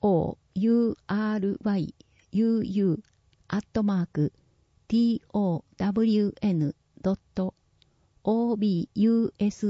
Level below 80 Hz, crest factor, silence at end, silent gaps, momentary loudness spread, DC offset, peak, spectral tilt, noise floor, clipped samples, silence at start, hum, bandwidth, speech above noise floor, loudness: -56 dBFS; 14 dB; 0 s; none; 9 LU; under 0.1%; -14 dBFS; -8.5 dB/octave; -65 dBFS; under 0.1%; 0 s; none; 7.6 kHz; 40 dB; -27 LUFS